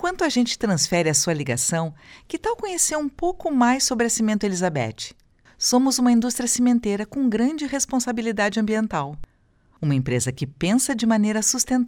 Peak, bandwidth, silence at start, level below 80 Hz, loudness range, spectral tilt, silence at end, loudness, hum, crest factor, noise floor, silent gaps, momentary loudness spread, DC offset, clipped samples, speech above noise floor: -6 dBFS; 18 kHz; 0 s; -50 dBFS; 3 LU; -4 dB/octave; 0 s; -21 LUFS; none; 16 dB; -59 dBFS; none; 8 LU; under 0.1%; under 0.1%; 38 dB